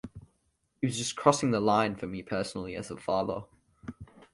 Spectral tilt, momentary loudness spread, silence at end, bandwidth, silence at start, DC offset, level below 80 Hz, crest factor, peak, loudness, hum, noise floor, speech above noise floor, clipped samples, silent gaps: -5 dB/octave; 20 LU; 0.3 s; 11.5 kHz; 0.05 s; under 0.1%; -60 dBFS; 24 dB; -6 dBFS; -30 LUFS; none; -75 dBFS; 46 dB; under 0.1%; none